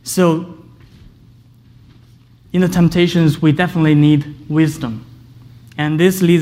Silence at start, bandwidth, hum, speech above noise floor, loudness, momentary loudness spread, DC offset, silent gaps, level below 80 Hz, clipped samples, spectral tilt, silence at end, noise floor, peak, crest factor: 0.05 s; 16 kHz; none; 32 dB; -15 LUFS; 13 LU; under 0.1%; none; -46 dBFS; under 0.1%; -6.5 dB/octave; 0 s; -46 dBFS; -2 dBFS; 14 dB